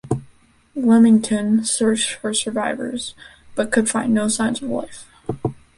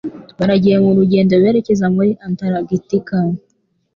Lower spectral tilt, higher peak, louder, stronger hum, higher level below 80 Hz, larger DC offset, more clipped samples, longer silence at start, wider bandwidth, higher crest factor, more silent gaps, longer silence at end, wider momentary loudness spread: second, -4 dB/octave vs -8.5 dB/octave; about the same, -4 dBFS vs -2 dBFS; second, -19 LUFS vs -15 LUFS; neither; about the same, -52 dBFS vs -50 dBFS; neither; neither; about the same, 0.05 s vs 0.05 s; first, 11.5 kHz vs 7 kHz; about the same, 16 dB vs 12 dB; neither; second, 0.25 s vs 0.6 s; first, 15 LU vs 9 LU